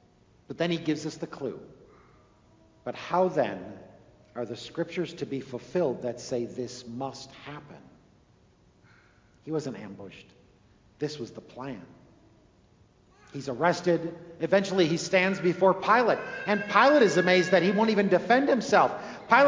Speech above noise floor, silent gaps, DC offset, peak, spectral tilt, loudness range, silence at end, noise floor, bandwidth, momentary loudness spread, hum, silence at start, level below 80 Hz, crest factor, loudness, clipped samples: 35 dB; none; under 0.1%; -6 dBFS; -5.5 dB/octave; 18 LU; 0 s; -61 dBFS; 7.6 kHz; 20 LU; none; 0.5 s; -66 dBFS; 22 dB; -26 LUFS; under 0.1%